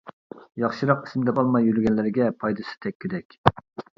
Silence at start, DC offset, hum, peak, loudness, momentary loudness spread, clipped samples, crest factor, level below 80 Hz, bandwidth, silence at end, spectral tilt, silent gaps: 0.05 s; under 0.1%; none; 0 dBFS; -24 LUFS; 12 LU; under 0.1%; 24 dB; -52 dBFS; 7 kHz; 0.15 s; -8.5 dB/octave; 0.13-0.30 s, 2.95-3.00 s, 3.25-3.30 s, 3.38-3.44 s